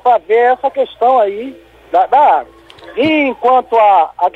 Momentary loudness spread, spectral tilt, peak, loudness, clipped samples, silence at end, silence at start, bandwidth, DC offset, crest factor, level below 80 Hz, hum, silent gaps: 8 LU; -6 dB/octave; 0 dBFS; -12 LUFS; under 0.1%; 0.05 s; 0.05 s; 7.6 kHz; under 0.1%; 12 dB; -54 dBFS; none; none